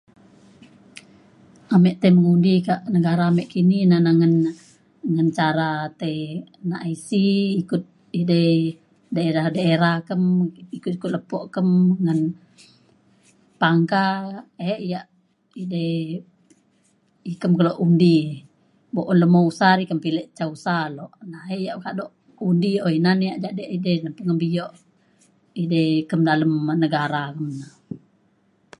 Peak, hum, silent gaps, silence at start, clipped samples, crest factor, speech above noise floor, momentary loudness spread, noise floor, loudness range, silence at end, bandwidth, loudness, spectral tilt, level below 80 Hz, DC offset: -2 dBFS; none; none; 0.95 s; under 0.1%; 18 dB; 43 dB; 15 LU; -62 dBFS; 5 LU; 0.85 s; 11 kHz; -21 LUFS; -8 dB/octave; -66 dBFS; under 0.1%